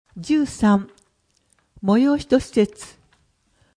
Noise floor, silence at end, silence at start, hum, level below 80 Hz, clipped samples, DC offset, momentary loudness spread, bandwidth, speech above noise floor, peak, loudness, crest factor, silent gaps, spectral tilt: -65 dBFS; 0.9 s; 0.15 s; none; -48 dBFS; under 0.1%; under 0.1%; 20 LU; 10.5 kHz; 46 dB; -4 dBFS; -20 LUFS; 18 dB; none; -6.5 dB/octave